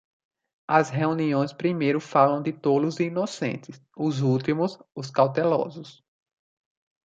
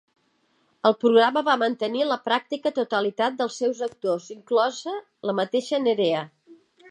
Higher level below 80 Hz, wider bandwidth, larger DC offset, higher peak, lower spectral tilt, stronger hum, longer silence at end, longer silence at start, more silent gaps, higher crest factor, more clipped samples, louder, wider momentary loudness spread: first, -70 dBFS vs -80 dBFS; second, 9 kHz vs 10.5 kHz; neither; about the same, -4 dBFS vs -4 dBFS; first, -7 dB/octave vs -4.5 dB/octave; neither; first, 1.15 s vs 0.35 s; second, 0.7 s vs 0.85 s; neither; about the same, 22 dB vs 20 dB; neither; about the same, -24 LUFS vs -24 LUFS; about the same, 11 LU vs 10 LU